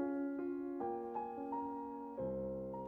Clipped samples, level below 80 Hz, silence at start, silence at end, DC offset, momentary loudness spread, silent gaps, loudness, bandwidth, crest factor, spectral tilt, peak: under 0.1%; -66 dBFS; 0 s; 0 s; under 0.1%; 3 LU; none; -43 LUFS; 3.4 kHz; 12 dB; -10.5 dB/octave; -30 dBFS